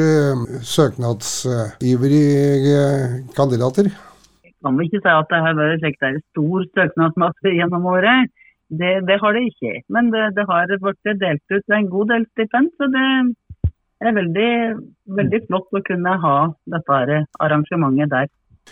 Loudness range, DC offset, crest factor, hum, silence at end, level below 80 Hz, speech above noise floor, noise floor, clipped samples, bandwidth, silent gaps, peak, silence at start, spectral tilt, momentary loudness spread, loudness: 2 LU; under 0.1%; 16 dB; none; 0.45 s; -46 dBFS; 35 dB; -52 dBFS; under 0.1%; 16 kHz; none; -2 dBFS; 0 s; -6 dB/octave; 8 LU; -18 LUFS